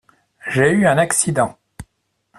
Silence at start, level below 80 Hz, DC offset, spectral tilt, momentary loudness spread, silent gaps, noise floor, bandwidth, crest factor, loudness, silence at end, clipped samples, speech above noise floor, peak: 0.45 s; -52 dBFS; under 0.1%; -4.5 dB/octave; 9 LU; none; -69 dBFS; 13 kHz; 18 dB; -16 LUFS; 0.55 s; under 0.1%; 53 dB; -2 dBFS